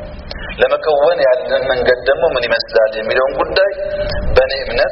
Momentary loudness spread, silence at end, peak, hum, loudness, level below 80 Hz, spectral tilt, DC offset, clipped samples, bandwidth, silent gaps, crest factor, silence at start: 7 LU; 0 s; 0 dBFS; none; -14 LUFS; -30 dBFS; -2 dB/octave; under 0.1%; under 0.1%; 5.8 kHz; none; 14 dB; 0 s